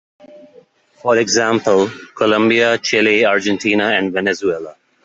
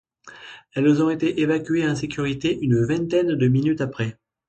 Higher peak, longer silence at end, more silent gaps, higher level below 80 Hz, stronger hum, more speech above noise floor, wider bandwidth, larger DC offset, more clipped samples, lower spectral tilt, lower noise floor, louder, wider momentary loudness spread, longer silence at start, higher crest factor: first, -2 dBFS vs -8 dBFS; about the same, 0.35 s vs 0.35 s; neither; second, -60 dBFS vs -54 dBFS; neither; first, 34 dB vs 23 dB; about the same, 8 kHz vs 8.8 kHz; neither; neither; second, -3.5 dB/octave vs -7 dB/octave; first, -49 dBFS vs -44 dBFS; first, -15 LUFS vs -22 LUFS; about the same, 9 LU vs 10 LU; about the same, 0.35 s vs 0.25 s; about the same, 14 dB vs 14 dB